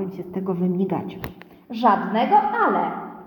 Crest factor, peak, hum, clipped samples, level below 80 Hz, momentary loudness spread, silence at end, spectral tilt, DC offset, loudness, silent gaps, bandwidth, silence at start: 18 dB; -4 dBFS; none; under 0.1%; -58 dBFS; 16 LU; 0 s; -8.5 dB/octave; under 0.1%; -21 LUFS; none; 18 kHz; 0 s